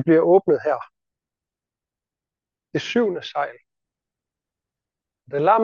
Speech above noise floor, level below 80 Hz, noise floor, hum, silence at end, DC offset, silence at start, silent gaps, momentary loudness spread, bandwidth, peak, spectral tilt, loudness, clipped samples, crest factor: 70 dB; -76 dBFS; -89 dBFS; none; 0 s; under 0.1%; 0 s; none; 14 LU; 7.2 kHz; -4 dBFS; -6.5 dB/octave; -21 LUFS; under 0.1%; 18 dB